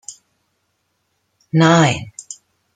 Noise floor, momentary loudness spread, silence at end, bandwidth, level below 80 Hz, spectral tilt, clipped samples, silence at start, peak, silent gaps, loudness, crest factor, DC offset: -69 dBFS; 24 LU; 0.4 s; 9.4 kHz; -56 dBFS; -5.5 dB/octave; under 0.1%; 0.1 s; -2 dBFS; none; -15 LUFS; 18 dB; under 0.1%